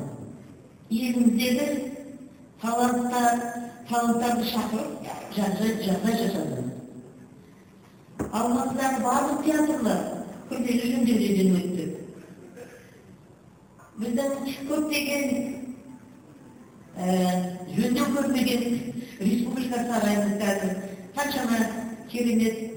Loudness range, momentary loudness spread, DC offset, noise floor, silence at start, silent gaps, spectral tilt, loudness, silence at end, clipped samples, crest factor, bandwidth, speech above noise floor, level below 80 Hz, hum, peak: 5 LU; 18 LU; under 0.1%; -52 dBFS; 0 s; none; -5 dB/octave; -26 LUFS; 0 s; under 0.1%; 18 dB; over 20 kHz; 27 dB; -60 dBFS; none; -8 dBFS